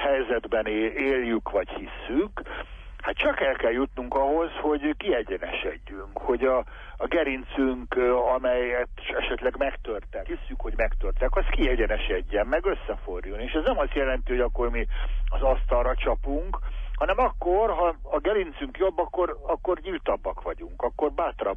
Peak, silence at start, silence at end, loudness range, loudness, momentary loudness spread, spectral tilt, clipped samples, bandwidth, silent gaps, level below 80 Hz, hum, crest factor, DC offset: -12 dBFS; 0 s; 0 s; 2 LU; -27 LUFS; 10 LU; -8 dB/octave; under 0.1%; 3.7 kHz; none; -32 dBFS; none; 14 dB; under 0.1%